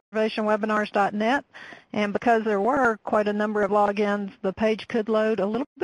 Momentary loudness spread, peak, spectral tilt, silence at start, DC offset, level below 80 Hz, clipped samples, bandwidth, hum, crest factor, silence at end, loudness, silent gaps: 6 LU; -8 dBFS; -6 dB/octave; 0.1 s; under 0.1%; -60 dBFS; under 0.1%; 11 kHz; none; 16 dB; 0 s; -24 LUFS; 5.66-5.76 s